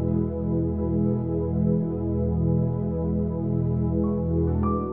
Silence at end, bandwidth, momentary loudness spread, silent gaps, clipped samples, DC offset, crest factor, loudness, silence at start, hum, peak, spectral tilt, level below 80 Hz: 0 s; 2.5 kHz; 2 LU; none; under 0.1%; 0.4%; 12 dB; -25 LUFS; 0 s; none; -12 dBFS; -14 dB/octave; -36 dBFS